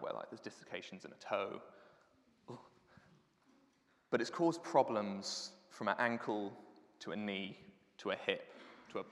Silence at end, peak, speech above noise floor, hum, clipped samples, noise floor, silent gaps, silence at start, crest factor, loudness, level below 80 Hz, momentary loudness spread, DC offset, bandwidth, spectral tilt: 0 s; -16 dBFS; 35 dB; none; under 0.1%; -74 dBFS; none; 0 s; 26 dB; -40 LUFS; -90 dBFS; 21 LU; under 0.1%; 12 kHz; -4.5 dB/octave